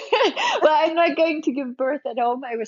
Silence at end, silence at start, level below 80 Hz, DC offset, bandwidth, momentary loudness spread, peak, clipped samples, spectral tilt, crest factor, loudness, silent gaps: 0 s; 0 s; -76 dBFS; under 0.1%; 7.6 kHz; 8 LU; -4 dBFS; under 0.1%; 0.5 dB/octave; 18 dB; -21 LUFS; none